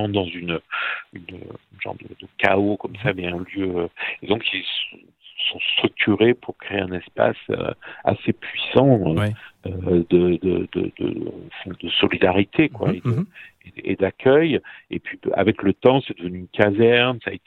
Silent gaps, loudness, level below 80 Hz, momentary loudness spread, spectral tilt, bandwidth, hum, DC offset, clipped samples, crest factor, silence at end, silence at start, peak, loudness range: none; -21 LUFS; -52 dBFS; 15 LU; -8 dB/octave; 4.5 kHz; none; under 0.1%; under 0.1%; 20 dB; 0.1 s; 0 s; 0 dBFS; 4 LU